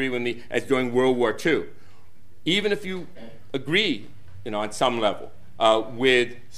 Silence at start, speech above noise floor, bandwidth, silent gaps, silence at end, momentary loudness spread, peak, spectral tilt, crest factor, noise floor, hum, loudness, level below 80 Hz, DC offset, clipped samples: 0 s; 32 dB; 13.5 kHz; none; 0 s; 13 LU; -4 dBFS; -4.5 dB/octave; 20 dB; -56 dBFS; none; -24 LUFS; -60 dBFS; 2%; under 0.1%